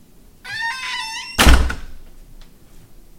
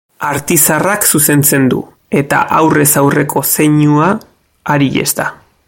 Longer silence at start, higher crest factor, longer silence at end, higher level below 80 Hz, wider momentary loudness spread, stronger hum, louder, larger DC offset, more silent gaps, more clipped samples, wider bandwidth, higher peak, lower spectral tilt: first, 0.45 s vs 0.2 s; first, 20 dB vs 12 dB; about the same, 0.25 s vs 0.35 s; first, -22 dBFS vs -46 dBFS; first, 17 LU vs 9 LU; neither; second, -19 LUFS vs -11 LUFS; neither; neither; neither; about the same, 17 kHz vs 17.5 kHz; about the same, 0 dBFS vs 0 dBFS; about the same, -3.5 dB/octave vs -4.5 dB/octave